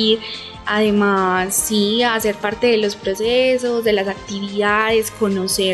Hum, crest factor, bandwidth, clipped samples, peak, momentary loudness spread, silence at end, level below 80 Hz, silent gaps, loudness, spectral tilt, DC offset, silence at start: none; 14 dB; 13.5 kHz; under 0.1%; -4 dBFS; 6 LU; 0 s; -46 dBFS; none; -17 LUFS; -3.5 dB/octave; under 0.1%; 0 s